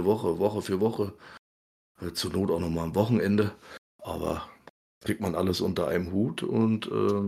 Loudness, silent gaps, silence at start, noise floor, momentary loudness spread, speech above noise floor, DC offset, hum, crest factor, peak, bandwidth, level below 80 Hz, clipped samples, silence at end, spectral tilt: -28 LUFS; 1.39-1.95 s, 3.78-3.99 s, 4.70-5.01 s; 0 s; under -90 dBFS; 13 LU; over 63 dB; under 0.1%; none; 20 dB; -8 dBFS; 15 kHz; -54 dBFS; under 0.1%; 0 s; -6.5 dB/octave